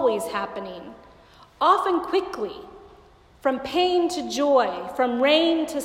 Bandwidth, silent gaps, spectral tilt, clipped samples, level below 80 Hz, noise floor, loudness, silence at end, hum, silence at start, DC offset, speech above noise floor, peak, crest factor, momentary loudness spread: 16 kHz; none; -3.5 dB/octave; under 0.1%; -58 dBFS; -52 dBFS; -23 LUFS; 0 s; none; 0 s; under 0.1%; 29 dB; -6 dBFS; 18 dB; 15 LU